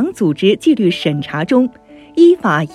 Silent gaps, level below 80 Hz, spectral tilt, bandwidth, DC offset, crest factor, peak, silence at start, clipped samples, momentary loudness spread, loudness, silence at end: none; -56 dBFS; -6.5 dB/octave; 12 kHz; under 0.1%; 14 dB; 0 dBFS; 0 s; under 0.1%; 9 LU; -14 LUFS; 0 s